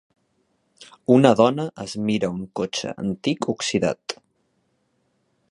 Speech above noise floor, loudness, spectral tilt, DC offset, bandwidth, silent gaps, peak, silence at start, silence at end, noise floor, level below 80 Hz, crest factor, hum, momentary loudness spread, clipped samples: 48 dB; -22 LUFS; -5.5 dB/octave; under 0.1%; 11.5 kHz; none; 0 dBFS; 0.8 s; 1.35 s; -69 dBFS; -60 dBFS; 22 dB; none; 15 LU; under 0.1%